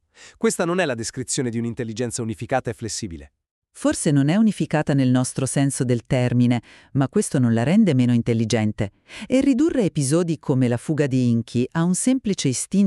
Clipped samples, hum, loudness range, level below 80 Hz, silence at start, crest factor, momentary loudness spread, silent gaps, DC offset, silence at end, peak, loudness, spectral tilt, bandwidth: under 0.1%; none; 5 LU; -52 dBFS; 0.2 s; 14 dB; 10 LU; 3.51-3.62 s; under 0.1%; 0 s; -6 dBFS; -21 LUFS; -6 dB/octave; 13 kHz